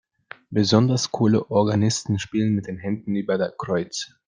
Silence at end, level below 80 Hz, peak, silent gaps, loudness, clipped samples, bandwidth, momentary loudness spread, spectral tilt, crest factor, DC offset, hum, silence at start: 0.2 s; -60 dBFS; -4 dBFS; none; -22 LUFS; under 0.1%; 9.8 kHz; 8 LU; -5.5 dB/octave; 20 dB; under 0.1%; none; 0.5 s